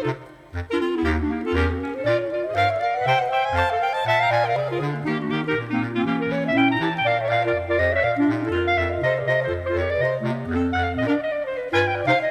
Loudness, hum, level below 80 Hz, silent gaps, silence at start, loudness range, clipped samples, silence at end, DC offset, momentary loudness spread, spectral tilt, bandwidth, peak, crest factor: -22 LUFS; none; -40 dBFS; none; 0 s; 2 LU; under 0.1%; 0 s; under 0.1%; 5 LU; -7 dB/octave; 13.5 kHz; -6 dBFS; 16 dB